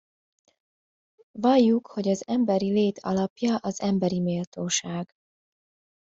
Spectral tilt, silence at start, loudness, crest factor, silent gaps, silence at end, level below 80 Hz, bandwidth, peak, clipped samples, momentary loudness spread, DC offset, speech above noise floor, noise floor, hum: -5.5 dB/octave; 1.35 s; -25 LUFS; 18 dB; 3.30-3.36 s, 4.47-4.52 s; 0.95 s; -66 dBFS; 7.8 kHz; -8 dBFS; under 0.1%; 10 LU; under 0.1%; over 66 dB; under -90 dBFS; none